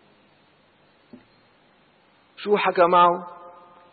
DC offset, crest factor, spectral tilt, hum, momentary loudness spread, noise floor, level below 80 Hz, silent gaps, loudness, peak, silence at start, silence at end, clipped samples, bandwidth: under 0.1%; 18 dB; -9.5 dB/octave; none; 24 LU; -59 dBFS; -70 dBFS; none; -19 LUFS; -6 dBFS; 2.4 s; 0.45 s; under 0.1%; 4.7 kHz